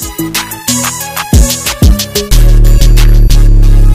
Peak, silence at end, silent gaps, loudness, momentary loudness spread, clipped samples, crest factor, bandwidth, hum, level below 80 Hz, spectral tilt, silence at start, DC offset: 0 dBFS; 0 s; none; -9 LUFS; 6 LU; 0.7%; 6 dB; 15.5 kHz; none; -6 dBFS; -4 dB/octave; 0 s; under 0.1%